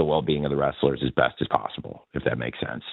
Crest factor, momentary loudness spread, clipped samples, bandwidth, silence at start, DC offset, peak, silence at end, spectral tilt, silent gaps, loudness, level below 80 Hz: 22 dB; 10 LU; under 0.1%; 4.4 kHz; 0 s; under 0.1%; -2 dBFS; 0 s; -9.5 dB/octave; none; -26 LUFS; -48 dBFS